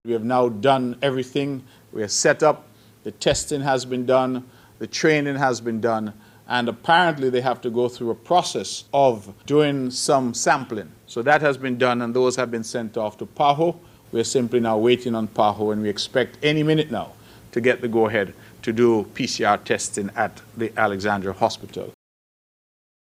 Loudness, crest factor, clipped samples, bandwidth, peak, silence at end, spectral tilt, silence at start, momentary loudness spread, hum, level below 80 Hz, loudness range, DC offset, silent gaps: -22 LUFS; 18 dB; under 0.1%; 16 kHz; -4 dBFS; 1.1 s; -4.5 dB/octave; 0.05 s; 11 LU; none; -56 dBFS; 2 LU; under 0.1%; none